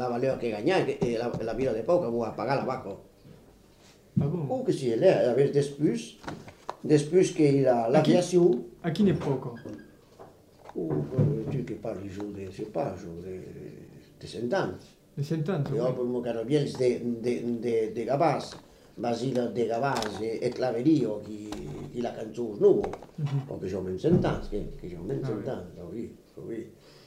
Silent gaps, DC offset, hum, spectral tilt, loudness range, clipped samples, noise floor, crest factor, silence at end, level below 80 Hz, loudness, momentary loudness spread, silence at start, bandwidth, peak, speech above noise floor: none; under 0.1%; none; -7 dB/octave; 8 LU; under 0.1%; -56 dBFS; 20 dB; 0.35 s; -54 dBFS; -28 LUFS; 17 LU; 0 s; 14.5 kHz; -8 dBFS; 29 dB